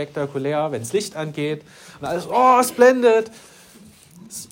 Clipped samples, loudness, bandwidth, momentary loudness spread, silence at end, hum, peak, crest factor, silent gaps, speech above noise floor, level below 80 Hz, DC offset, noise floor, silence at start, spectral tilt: under 0.1%; -19 LUFS; 16.5 kHz; 19 LU; 0.05 s; none; -2 dBFS; 18 dB; none; 28 dB; -64 dBFS; under 0.1%; -47 dBFS; 0 s; -4.5 dB/octave